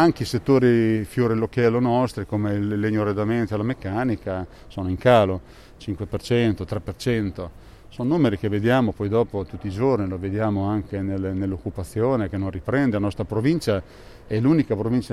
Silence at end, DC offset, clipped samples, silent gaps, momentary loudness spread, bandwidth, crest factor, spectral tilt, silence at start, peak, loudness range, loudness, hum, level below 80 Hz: 0 s; under 0.1%; under 0.1%; none; 11 LU; 13.5 kHz; 18 dB; -7.5 dB/octave; 0 s; -4 dBFS; 3 LU; -23 LUFS; none; -46 dBFS